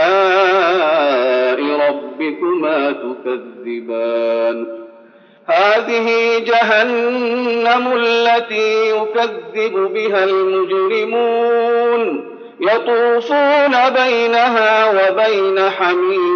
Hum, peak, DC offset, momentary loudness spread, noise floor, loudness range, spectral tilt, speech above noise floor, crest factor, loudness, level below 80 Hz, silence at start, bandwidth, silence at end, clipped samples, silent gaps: none; -4 dBFS; under 0.1%; 9 LU; -45 dBFS; 5 LU; -0.5 dB/octave; 30 dB; 12 dB; -15 LUFS; -88 dBFS; 0 s; 6.8 kHz; 0 s; under 0.1%; none